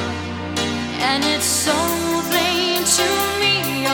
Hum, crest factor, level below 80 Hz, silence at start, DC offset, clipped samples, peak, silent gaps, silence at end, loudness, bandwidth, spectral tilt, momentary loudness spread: none; 16 dB; -46 dBFS; 0 s; under 0.1%; under 0.1%; -4 dBFS; none; 0 s; -18 LUFS; over 20 kHz; -2 dB/octave; 7 LU